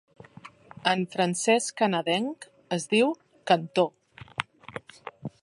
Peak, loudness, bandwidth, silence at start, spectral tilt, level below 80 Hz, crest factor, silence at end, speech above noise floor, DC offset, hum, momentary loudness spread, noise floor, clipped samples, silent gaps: -4 dBFS; -26 LUFS; 11.5 kHz; 0.45 s; -4 dB/octave; -70 dBFS; 24 dB; 0.15 s; 25 dB; under 0.1%; none; 17 LU; -50 dBFS; under 0.1%; none